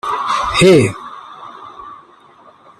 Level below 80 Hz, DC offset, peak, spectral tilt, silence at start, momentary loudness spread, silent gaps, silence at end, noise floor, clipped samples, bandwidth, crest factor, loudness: -44 dBFS; under 0.1%; 0 dBFS; -5 dB/octave; 0.05 s; 25 LU; none; 0.85 s; -45 dBFS; under 0.1%; 13 kHz; 16 dB; -12 LUFS